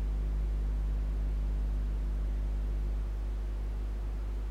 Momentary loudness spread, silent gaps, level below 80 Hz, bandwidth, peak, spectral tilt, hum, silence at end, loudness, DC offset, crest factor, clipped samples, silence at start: 3 LU; none; -32 dBFS; 4.5 kHz; -24 dBFS; -8 dB/octave; 50 Hz at -30 dBFS; 0 s; -36 LUFS; under 0.1%; 6 dB; under 0.1%; 0 s